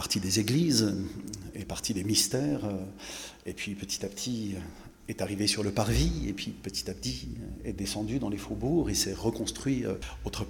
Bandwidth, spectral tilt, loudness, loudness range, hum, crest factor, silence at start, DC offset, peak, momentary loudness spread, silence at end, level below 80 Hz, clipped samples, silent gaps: 18 kHz; -4 dB/octave; -31 LUFS; 3 LU; none; 20 dB; 0 s; under 0.1%; -10 dBFS; 14 LU; 0 s; -44 dBFS; under 0.1%; none